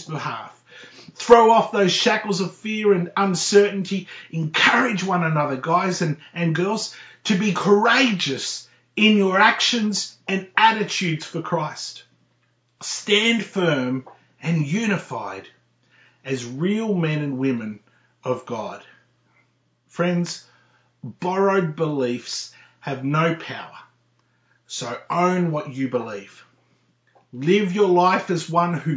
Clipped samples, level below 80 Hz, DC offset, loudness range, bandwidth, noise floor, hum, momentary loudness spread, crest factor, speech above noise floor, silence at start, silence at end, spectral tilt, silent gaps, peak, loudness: under 0.1%; -68 dBFS; under 0.1%; 8 LU; 8 kHz; -65 dBFS; none; 17 LU; 22 dB; 45 dB; 0 s; 0 s; -4.5 dB/octave; none; 0 dBFS; -21 LUFS